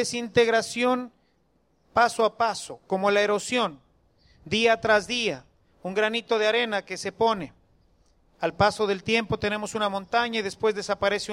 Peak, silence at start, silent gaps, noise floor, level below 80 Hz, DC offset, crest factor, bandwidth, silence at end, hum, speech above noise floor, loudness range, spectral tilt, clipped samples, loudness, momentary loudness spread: -6 dBFS; 0 s; none; -68 dBFS; -58 dBFS; under 0.1%; 18 dB; 14 kHz; 0 s; none; 43 dB; 2 LU; -3.5 dB/octave; under 0.1%; -25 LUFS; 9 LU